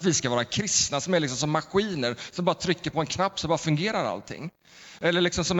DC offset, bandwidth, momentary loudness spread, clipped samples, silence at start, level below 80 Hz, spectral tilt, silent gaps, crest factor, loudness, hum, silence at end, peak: under 0.1%; 17 kHz; 7 LU; under 0.1%; 0 s; -54 dBFS; -3.5 dB/octave; none; 18 dB; -26 LUFS; none; 0 s; -8 dBFS